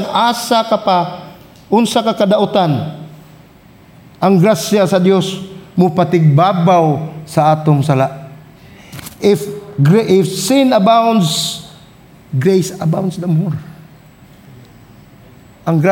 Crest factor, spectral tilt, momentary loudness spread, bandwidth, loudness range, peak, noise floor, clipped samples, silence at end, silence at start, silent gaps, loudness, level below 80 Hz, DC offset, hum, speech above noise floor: 12 dB; -6 dB/octave; 13 LU; 17 kHz; 6 LU; -2 dBFS; -42 dBFS; under 0.1%; 0 s; 0 s; none; -13 LUFS; -54 dBFS; under 0.1%; none; 30 dB